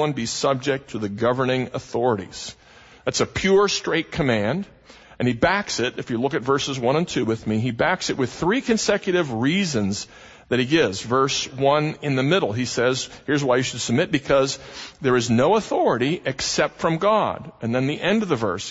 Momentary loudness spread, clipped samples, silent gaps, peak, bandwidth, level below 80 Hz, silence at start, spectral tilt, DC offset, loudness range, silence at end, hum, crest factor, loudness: 7 LU; under 0.1%; none; -4 dBFS; 8 kHz; -52 dBFS; 0 s; -4.5 dB/octave; under 0.1%; 2 LU; 0 s; none; 18 dB; -22 LUFS